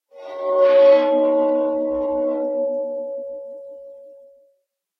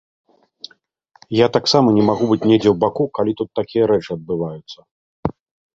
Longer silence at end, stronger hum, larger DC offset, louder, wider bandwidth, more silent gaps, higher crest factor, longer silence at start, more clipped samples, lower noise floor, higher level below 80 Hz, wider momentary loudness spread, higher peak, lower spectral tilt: first, 0.85 s vs 0.45 s; neither; neither; about the same, -18 LUFS vs -18 LUFS; second, 5.6 kHz vs 7.8 kHz; second, none vs 4.91-5.23 s; about the same, 16 dB vs 18 dB; second, 0.15 s vs 1.3 s; neither; first, -68 dBFS vs -58 dBFS; second, -60 dBFS vs -50 dBFS; about the same, 23 LU vs 22 LU; about the same, -4 dBFS vs -2 dBFS; about the same, -6 dB/octave vs -6.5 dB/octave